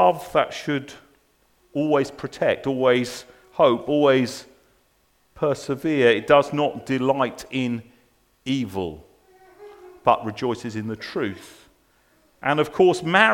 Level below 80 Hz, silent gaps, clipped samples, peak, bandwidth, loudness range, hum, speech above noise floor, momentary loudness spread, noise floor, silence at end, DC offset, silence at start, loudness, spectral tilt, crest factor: -58 dBFS; none; under 0.1%; 0 dBFS; 17.5 kHz; 6 LU; none; 42 dB; 12 LU; -63 dBFS; 0 s; under 0.1%; 0 s; -22 LUFS; -5.5 dB/octave; 22 dB